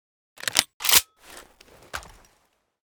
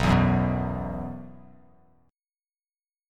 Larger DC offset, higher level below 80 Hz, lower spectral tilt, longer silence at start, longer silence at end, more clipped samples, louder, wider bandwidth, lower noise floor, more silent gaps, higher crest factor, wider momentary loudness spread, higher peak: neither; second, -56 dBFS vs -40 dBFS; second, 1.5 dB/octave vs -7.5 dB/octave; first, 0.45 s vs 0 s; second, 0.9 s vs 1.75 s; neither; first, -20 LUFS vs -26 LUFS; first, over 20 kHz vs 11 kHz; second, -68 dBFS vs under -90 dBFS; first, 0.74-0.80 s vs none; first, 28 dB vs 22 dB; about the same, 20 LU vs 20 LU; first, 0 dBFS vs -6 dBFS